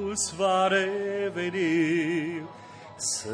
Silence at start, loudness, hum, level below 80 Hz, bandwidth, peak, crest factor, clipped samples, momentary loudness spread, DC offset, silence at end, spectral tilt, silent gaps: 0 s; -26 LUFS; none; -64 dBFS; 10.5 kHz; -14 dBFS; 14 dB; under 0.1%; 15 LU; under 0.1%; 0 s; -3.5 dB/octave; none